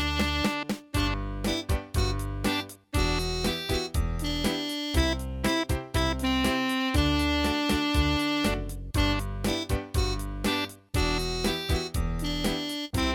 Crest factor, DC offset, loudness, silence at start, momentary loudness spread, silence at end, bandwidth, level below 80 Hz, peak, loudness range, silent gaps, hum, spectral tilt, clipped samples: 16 dB; under 0.1%; -28 LUFS; 0 s; 5 LU; 0 s; over 20 kHz; -34 dBFS; -12 dBFS; 3 LU; none; none; -4.5 dB/octave; under 0.1%